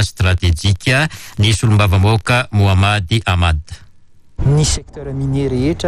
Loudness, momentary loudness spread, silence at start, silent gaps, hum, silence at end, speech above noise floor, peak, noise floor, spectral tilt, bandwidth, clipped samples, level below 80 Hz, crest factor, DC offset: -15 LUFS; 8 LU; 0 s; none; none; 0 s; 27 dB; -2 dBFS; -41 dBFS; -5 dB/octave; 13 kHz; under 0.1%; -28 dBFS; 12 dB; under 0.1%